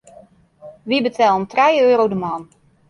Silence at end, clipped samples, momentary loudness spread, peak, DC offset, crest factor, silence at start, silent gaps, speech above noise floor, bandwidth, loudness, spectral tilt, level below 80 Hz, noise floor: 0.45 s; under 0.1%; 14 LU; -4 dBFS; under 0.1%; 16 dB; 0.65 s; none; 31 dB; 10.5 kHz; -16 LUFS; -5.5 dB/octave; -60 dBFS; -47 dBFS